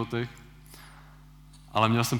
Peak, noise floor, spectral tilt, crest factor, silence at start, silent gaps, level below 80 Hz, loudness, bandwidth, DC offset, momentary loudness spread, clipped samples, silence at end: -8 dBFS; -51 dBFS; -5 dB/octave; 22 dB; 0 s; none; -54 dBFS; -28 LUFS; 19 kHz; under 0.1%; 26 LU; under 0.1%; 0 s